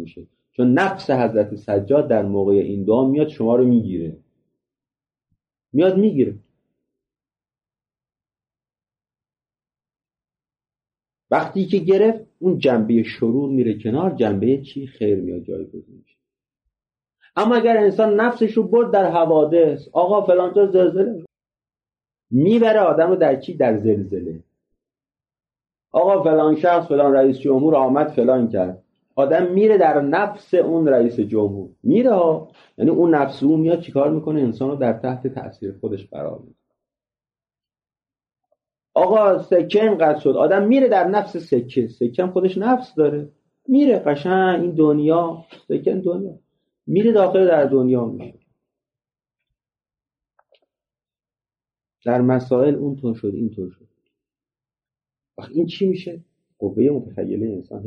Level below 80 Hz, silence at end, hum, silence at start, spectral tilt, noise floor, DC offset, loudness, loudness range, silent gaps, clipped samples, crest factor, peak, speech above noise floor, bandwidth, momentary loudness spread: -64 dBFS; 0 s; none; 0 s; -9 dB/octave; under -90 dBFS; under 0.1%; -18 LUFS; 9 LU; none; under 0.1%; 14 dB; -4 dBFS; over 73 dB; 6.6 kHz; 13 LU